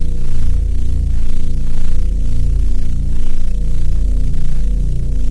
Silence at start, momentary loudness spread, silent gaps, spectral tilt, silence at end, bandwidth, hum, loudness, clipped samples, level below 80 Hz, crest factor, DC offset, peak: 0 s; 3 LU; none; -7.5 dB/octave; 0 s; 0.8 kHz; none; -21 LUFS; under 0.1%; -12 dBFS; 8 dB; under 0.1%; 0 dBFS